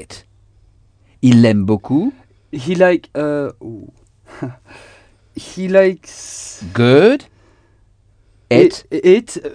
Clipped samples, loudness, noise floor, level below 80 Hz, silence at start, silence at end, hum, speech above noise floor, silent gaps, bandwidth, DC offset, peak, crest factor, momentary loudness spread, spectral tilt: under 0.1%; -14 LUFS; -53 dBFS; -52 dBFS; 0 s; 0.05 s; none; 38 dB; none; 10 kHz; under 0.1%; 0 dBFS; 16 dB; 20 LU; -6.5 dB/octave